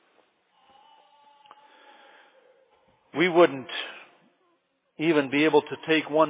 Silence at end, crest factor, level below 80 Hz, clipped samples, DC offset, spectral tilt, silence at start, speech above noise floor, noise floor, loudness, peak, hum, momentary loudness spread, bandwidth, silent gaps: 0 s; 20 dB; -82 dBFS; under 0.1%; under 0.1%; -9 dB/octave; 3.15 s; 48 dB; -71 dBFS; -24 LUFS; -6 dBFS; none; 16 LU; 4 kHz; none